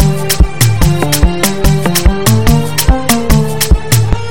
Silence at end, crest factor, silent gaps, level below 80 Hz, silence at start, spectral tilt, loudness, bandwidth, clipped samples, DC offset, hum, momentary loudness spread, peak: 0 s; 10 dB; none; -14 dBFS; 0 s; -4.5 dB/octave; -11 LUFS; over 20 kHz; 3%; 9%; none; 2 LU; 0 dBFS